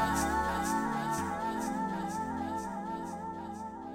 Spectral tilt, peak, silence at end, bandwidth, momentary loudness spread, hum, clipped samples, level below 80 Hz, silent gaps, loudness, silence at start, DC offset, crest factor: -4.5 dB/octave; -18 dBFS; 0 s; 16.5 kHz; 10 LU; none; under 0.1%; -50 dBFS; none; -34 LUFS; 0 s; under 0.1%; 16 dB